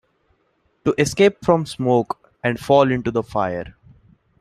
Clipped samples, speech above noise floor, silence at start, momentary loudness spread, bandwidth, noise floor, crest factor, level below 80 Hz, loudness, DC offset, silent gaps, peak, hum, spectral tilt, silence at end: under 0.1%; 47 dB; 0.85 s; 10 LU; 14 kHz; -65 dBFS; 18 dB; -50 dBFS; -20 LUFS; under 0.1%; none; -2 dBFS; none; -6 dB/octave; 0.7 s